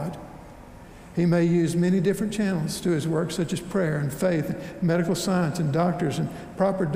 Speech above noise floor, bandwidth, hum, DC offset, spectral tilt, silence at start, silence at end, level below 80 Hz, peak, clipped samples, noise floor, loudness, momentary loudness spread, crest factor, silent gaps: 20 dB; 16 kHz; none; under 0.1%; -6.5 dB/octave; 0 s; 0 s; -52 dBFS; -10 dBFS; under 0.1%; -44 dBFS; -25 LUFS; 10 LU; 14 dB; none